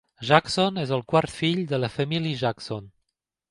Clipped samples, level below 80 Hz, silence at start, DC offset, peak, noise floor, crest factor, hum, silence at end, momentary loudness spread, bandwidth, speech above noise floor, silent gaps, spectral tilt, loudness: under 0.1%; -58 dBFS; 0.2 s; under 0.1%; 0 dBFS; -80 dBFS; 24 dB; none; 0.65 s; 9 LU; 11.5 kHz; 56 dB; none; -5.5 dB/octave; -24 LUFS